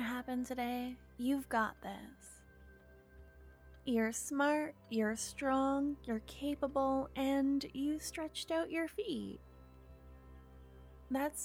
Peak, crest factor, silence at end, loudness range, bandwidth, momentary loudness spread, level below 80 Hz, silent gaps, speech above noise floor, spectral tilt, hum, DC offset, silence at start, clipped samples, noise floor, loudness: -22 dBFS; 16 dB; 0 s; 6 LU; 17.5 kHz; 23 LU; -60 dBFS; none; 23 dB; -4 dB/octave; none; under 0.1%; 0 s; under 0.1%; -60 dBFS; -37 LUFS